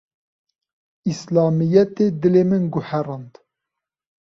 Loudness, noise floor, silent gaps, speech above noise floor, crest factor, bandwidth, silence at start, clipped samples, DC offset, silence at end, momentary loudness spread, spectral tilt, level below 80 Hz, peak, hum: -19 LUFS; -84 dBFS; none; 66 dB; 18 dB; 7.6 kHz; 1.05 s; under 0.1%; under 0.1%; 0.95 s; 12 LU; -8.5 dB/octave; -60 dBFS; -2 dBFS; none